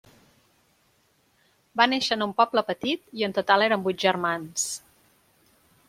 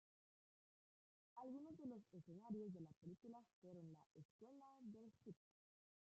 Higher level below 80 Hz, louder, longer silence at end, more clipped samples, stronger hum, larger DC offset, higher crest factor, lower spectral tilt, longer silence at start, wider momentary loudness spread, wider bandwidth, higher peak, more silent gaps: first, -70 dBFS vs under -90 dBFS; first, -24 LUFS vs -60 LUFS; first, 1.1 s vs 0.75 s; neither; neither; neither; first, 24 dB vs 18 dB; second, -2.5 dB/octave vs -10 dB/octave; first, 1.75 s vs 1.35 s; second, 8 LU vs 12 LU; first, 16.5 kHz vs 7.6 kHz; first, -2 dBFS vs -42 dBFS; second, none vs 2.96-3.01 s, 3.53-3.62 s, 4.06-4.10 s, 4.25-4.39 s